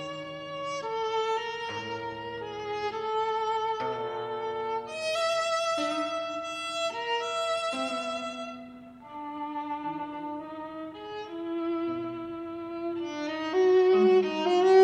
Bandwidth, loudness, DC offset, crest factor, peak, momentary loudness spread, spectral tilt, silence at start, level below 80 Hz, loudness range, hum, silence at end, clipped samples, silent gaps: 10.5 kHz; -30 LUFS; under 0.1%; 20 dB; -10 dBFS; 15 LU; -4 dB/octave; 0 s; -68 dBFS; 8 LU; none; 0 s; under 0.1%; none